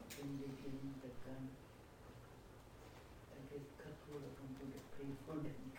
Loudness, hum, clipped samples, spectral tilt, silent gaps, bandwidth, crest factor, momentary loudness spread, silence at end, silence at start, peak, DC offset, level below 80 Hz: -53 LUFS; none; under 0.1%; -6.5 dB/octave; none; 17 kHz; 18 dB; 12 LU; 0 s; 0 s; -34 dBFS; under 0.1%; -66 dBFS